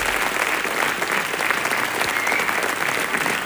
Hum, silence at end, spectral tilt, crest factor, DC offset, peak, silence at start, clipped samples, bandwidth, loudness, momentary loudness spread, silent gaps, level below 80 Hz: none; 0 s; -1.5 dB/octave; 18 dB; under 0.1%; -4 dBFS; 0 s; under 0.1%; over 20 kHz; -20 LUFS; 2 LU; none; -52 dBFS